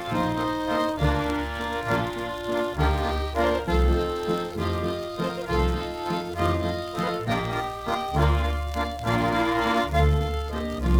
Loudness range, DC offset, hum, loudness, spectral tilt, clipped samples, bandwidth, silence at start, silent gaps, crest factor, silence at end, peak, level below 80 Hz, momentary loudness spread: 3 LU; under 0.1%; none; -26 LUFS; -6.5 dB/octave; under 0.1%; 19.5 kHz; 0 s; none; 16 dB; 0 s; -8 dBFS; -32 dBFS; 6 LU